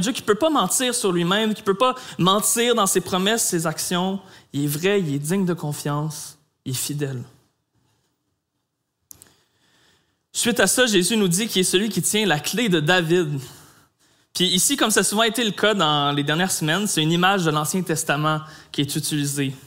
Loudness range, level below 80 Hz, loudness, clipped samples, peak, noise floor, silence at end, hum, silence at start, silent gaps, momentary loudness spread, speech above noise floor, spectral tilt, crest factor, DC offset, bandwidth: 11 LU; -62 dBFS; -20 LUFS; under 0.1%; -2 dBFS; -76 dBFS; 0.1 s; none; 0 s; none; 10 LU; 55 dB; -3.5 dB/octave; 20 dB; under 0.1%; 16 kHz